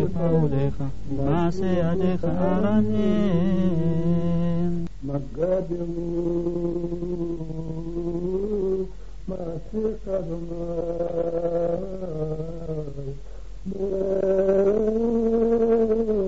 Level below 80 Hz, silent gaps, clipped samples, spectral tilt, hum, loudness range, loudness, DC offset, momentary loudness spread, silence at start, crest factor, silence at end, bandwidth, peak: -40 dBFS; none; under 0.1%; -9 dB/octave; none; 6 LU; -25 LUFS; 2%; 11 LU; 0 s; 14 dB; 0 s; 7.6 kHz; -8 dBFS